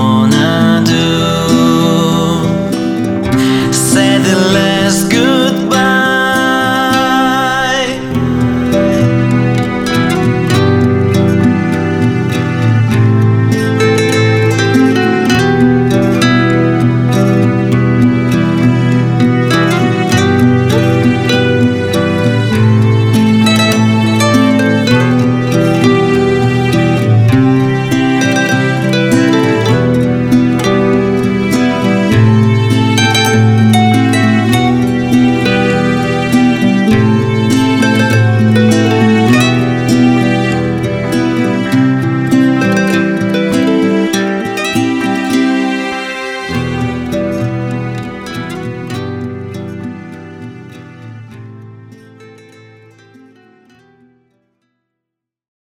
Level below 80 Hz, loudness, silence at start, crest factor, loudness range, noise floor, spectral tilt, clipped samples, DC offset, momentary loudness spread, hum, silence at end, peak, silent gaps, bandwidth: -38 dBFS; -11 LUFS; 0 s; 10 dB; 5 LU; -79 dBFS; -6 dB/octave; under 0.1%; under 0.1%; 6 LU; none; 3.4 s; 0 dBFS; none; 16 kHz